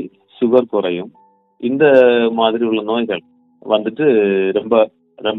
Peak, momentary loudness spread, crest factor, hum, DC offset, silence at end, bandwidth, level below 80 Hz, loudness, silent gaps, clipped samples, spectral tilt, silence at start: 0 dBFS; 14 LU; 16 dB; none; under 0.1%; 0 s; 4.1 kHz; -64 dBFS; -15 LUFS; none; under 0.1%; -8 dB/octave; 0 s